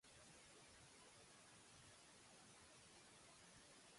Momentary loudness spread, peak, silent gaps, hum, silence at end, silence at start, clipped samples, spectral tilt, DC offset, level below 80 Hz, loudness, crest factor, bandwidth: 1 LU; -54 dBFS; none; none; 0 s; 0.05 s; under 0.1%; -2 dB/octave; under 0.1%; -84 dBFS; -65 LUFS; 14 dB; 11.5 kHz